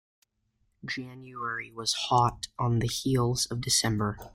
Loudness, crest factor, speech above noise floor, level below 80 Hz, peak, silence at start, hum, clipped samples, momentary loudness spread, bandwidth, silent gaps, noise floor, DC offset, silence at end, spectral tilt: -28 LUFS; 18 dB; 45 dB; -52 dBFS; -12 dBFS; 0.85 s; none; under 0.1%; 12 LU; 16 kHz; none; -74 dBFS; under 0.1%; 0.05 s; -4 dB/octave